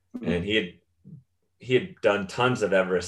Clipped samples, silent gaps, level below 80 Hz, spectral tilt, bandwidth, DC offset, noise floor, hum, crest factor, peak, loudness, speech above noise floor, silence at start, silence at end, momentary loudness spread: under 0.1%; none; -58 dBFS; -5.5 dB/octave; 11.5 kHz; under 0.1%; -52 dBFS; none; 18 dB; -8 dBFS; -25 LUFS; 27 dB; 0.15 s; 0 s; 6 LU